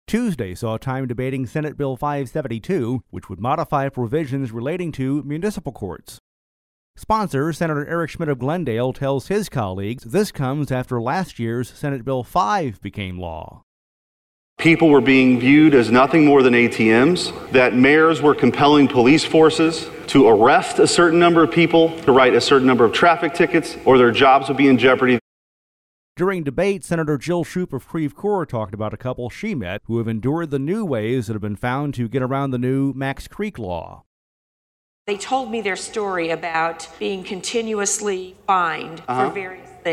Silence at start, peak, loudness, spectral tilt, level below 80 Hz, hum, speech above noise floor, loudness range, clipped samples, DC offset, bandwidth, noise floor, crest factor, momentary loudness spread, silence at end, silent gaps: 0.1 s; -4 dBFS; -18 LUFS; -5.5 dB/octave; -48 dBFS; none; over 72 dB; 11 LU; under 0.1%; under 0.1%; 15 kHz; under -90 dBFS; 14 dB; 14 LU; 0 s; 6.20-6.94 s, 13.63-14.56 s, 25.21-26.15 s, 34.06-35.05 s